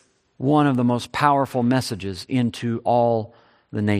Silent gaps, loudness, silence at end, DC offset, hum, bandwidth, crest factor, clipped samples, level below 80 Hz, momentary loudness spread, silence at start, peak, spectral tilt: none; -21 LUFS; 0 s; under 0.1%; none; 14.5 kHz; 18 dB; under 0.1%; -60 dBFS; 9 LU; 0.4 s; -2 dBFS; -6.5 dB/octave